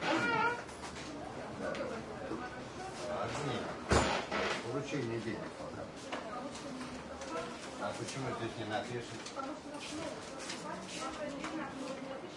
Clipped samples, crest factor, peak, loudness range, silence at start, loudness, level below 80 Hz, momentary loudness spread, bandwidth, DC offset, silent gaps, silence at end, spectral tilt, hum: under 0.1%; 24 dB; -16 dBFS; 5 LU; 0 s; -39 LUFS; -56 dBFS; 12 LU; 11.5 kHz; under 0.1%; none; 0 s; -4.5 dB/octave; none